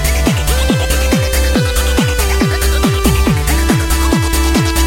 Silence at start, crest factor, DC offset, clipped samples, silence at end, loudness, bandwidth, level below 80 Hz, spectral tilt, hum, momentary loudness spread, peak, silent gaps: 0 s; 12 dB; under 0.1%; under 0.1%; 0 s; -13 LUFS; 17 kHz; -16 dBFS; -4.5 dB/octave; none; 1 LU; 0 dBFS; none